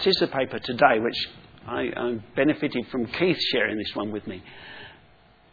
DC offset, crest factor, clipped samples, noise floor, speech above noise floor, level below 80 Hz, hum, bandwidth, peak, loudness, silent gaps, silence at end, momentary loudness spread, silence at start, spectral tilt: under 0.1%; 24 dB; under 0.1%; -56 dBFS; 31 dB; -58 dBFS; none; 5 kHz; -2 dBFS; -25 LUFS; none; 0.6 s; 21 LU; 0 s; -6 dB/octave